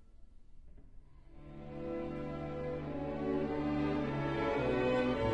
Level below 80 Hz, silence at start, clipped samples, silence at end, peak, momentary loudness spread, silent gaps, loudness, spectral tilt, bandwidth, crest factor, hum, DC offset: -52 dBFS; 0.05 s; under 0.1%; 0 s; -22 dBFS; 13 LU; none; -36 LUFS; -8 dB/octave; 9.2 kHz; 16 dB; none; 0.1%